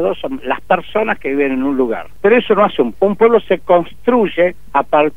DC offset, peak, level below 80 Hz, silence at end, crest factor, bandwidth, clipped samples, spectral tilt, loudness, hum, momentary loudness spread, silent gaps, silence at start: 3%; 0 dBFS; -46 dBFS; 0.05 s; 14 dB; 4 kHz; under 0.1%; -7.5 dB/octave; -15 LUFS; none; 7 LU; none; 0 s